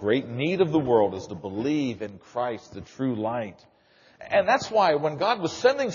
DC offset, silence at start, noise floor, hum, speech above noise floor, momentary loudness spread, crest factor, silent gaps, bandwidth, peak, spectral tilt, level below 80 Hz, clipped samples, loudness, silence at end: under 0.1%; 0 s; -52 dBFS; none; 28 dB; 13 LU; 18 dB; none; 7.2 kHz; -8 dBFS; -4.5 dB/octave; -62 dBFS; under 0.1%; -25 LUFS; 0 s